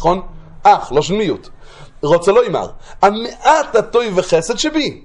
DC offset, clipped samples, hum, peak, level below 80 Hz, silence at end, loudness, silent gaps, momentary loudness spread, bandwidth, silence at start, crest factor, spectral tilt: under 0.1%; under 0.1%; none; 0 dBFS; -40 dBFS; 0.05 s; -15 LUFS; none; 10 LU; 11 kHz; 0 s; 16 dB; -4.5 dB/octave